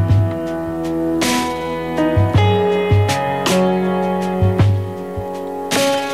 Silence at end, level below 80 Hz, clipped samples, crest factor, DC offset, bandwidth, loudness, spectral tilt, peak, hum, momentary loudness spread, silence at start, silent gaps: 0 s; -38 dBFS; under 0.1%; 12 dB; 0.4%; 15.5 kHz; -17 LUFS; -6 dB/octave; -4 dBFS; none; 9 LU; 0 s; none